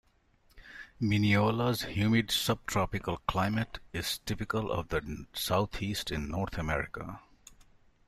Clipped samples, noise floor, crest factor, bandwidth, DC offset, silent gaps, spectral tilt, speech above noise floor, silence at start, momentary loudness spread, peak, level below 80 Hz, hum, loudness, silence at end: under 0.1%; -66 dBFS; 20 dB; 15.5 kHz; under 0.1%; none; -5 dB/octave; 35 dB; 0.55 s; 13 LU; -14 dBFS; -50 dBFS; none; -31 LUFS; 0.55 s